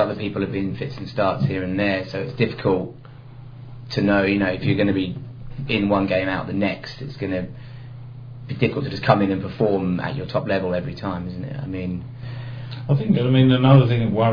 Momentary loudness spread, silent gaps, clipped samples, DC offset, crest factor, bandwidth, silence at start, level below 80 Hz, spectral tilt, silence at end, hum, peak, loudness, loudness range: 18 LU; none; under 0.1%; under 0.1%; 22 dB; 5.4 kHz; 0 s; -46 dBFS; -9 dB/octave; 0 s; none; 0 dBFS; -21 LUFS; 4 LU